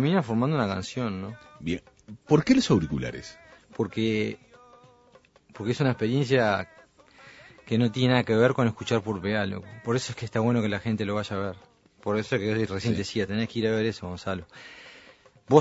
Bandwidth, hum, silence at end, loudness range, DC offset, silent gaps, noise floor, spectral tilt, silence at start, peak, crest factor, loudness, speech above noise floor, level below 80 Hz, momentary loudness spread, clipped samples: 8 kHz; none; 0 s; 4 LU; under 0.1%; none; -58 dBFS; -6.5 dB/octave; 0 s; -2 dBFS; 24 dB; -27 LUFS; 32 dB; -56 dBFS; 15 LU; under 0.1%